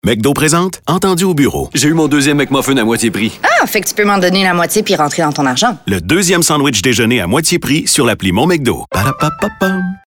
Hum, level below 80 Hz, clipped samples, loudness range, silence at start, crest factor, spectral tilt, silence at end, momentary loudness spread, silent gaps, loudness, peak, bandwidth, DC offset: none; -40 dBFS; under 0.1%; 1 LU; 0.05 s; 12 dB; -4 dB/octave; 0.1 s; 5 LU; none; -12 LUFS; 0 dBFS; 19 kHz; under 0.1%